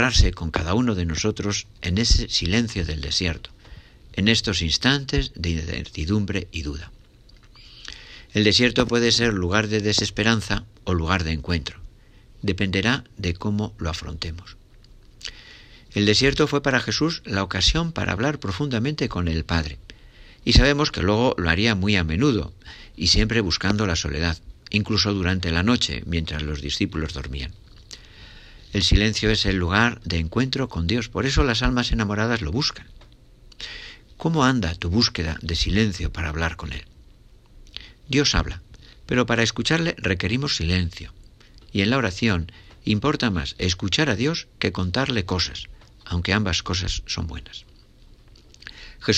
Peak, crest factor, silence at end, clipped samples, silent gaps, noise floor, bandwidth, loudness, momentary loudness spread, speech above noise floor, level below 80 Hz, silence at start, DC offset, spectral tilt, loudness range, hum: -2 dBFS; 22 dB; 0 s; under 0.1%; none; -50 dBFS; 9.8 kHz; -22 LUFS; 16 LU; 28 dB; -34 dBFS; 0 s; under 0.1%; -4.5 dB/octave; 5 LU; none